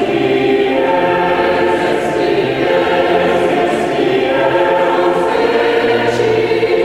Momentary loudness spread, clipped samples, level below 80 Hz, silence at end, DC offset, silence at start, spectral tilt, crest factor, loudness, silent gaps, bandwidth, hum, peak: 2 LU; under 0.1%; -46 dBFS; 0 s; 0.2%; 0 s; -5.5 dB/octave; 12 dB; -13 LUFS; none; 15 kHz; none; 0 dBFS